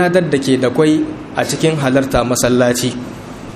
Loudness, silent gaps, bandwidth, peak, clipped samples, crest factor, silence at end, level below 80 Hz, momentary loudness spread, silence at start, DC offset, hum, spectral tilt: -15 LUFS; none; 15.5 kHz; 0 dBFS; under 0.1%; 14 dB; 0 s; -38 dBFS; 8 LU; 0 s; under 0.1%; none; -5 dB/octave